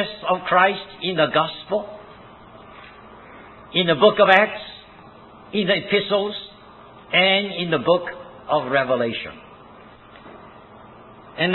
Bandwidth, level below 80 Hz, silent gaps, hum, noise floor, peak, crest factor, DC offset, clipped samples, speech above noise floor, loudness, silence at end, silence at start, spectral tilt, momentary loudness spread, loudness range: 4.3 kHz; -60 dBFS; none; none; -45 dBFS; 0 dBFS; 22 dB; under 0.1%; under 0.1%; 26 dB; -19 LUFS; 0 s; 0 s; -7 dB/octave; 20 LU; 6 LU